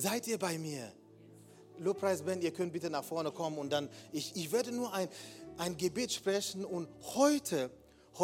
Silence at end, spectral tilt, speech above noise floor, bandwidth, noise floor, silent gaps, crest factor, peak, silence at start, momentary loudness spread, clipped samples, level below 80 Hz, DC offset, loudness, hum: 0 s; -4 dB/octave; 22 dB; 17.5 kHz; -58 dBFS; none; 22 dB; -16 dBFS; 0 s; 10 LU; under 0.1%; -74 dBFS; under 0.1%; -36 LUFS; none